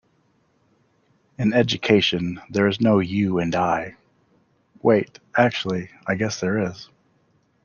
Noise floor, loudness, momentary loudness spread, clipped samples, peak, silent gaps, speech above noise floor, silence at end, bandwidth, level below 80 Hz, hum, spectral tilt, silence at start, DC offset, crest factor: -64 dBFS; -21 LUFS; 9 LU; under 0.1%; -4 dBFS; none; 43 dB; 0.8 s; 7.2 kHz; -58 dBFS; none; -5.5 dB/octave; 1.4 s; under 0.1%; 20 dB